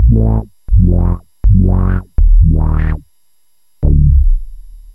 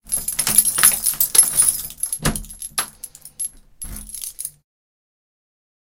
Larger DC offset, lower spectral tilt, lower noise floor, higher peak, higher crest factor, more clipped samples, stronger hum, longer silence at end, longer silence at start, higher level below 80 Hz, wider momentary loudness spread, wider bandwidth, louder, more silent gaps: first, 0.4% vs under 0.1%; first, -11.5 dB/octave vs -0.5 dB/octave; first, -62 dBFS vs -40 dBFS; about the same, 0 dBFS vs 0 dBFS; second, 10 dB vs 22 dB; neither; neither; second, 0.2 s vs 1.4 s; about the same, 0 s vs 0.05 s; first, -12 dBFS vs -40 dBFS; second, 8 LU vs 20 LU; second, 2.4 kHz vs 17.5 kHz; first, -13 LUFS vs -16 LUFS; neither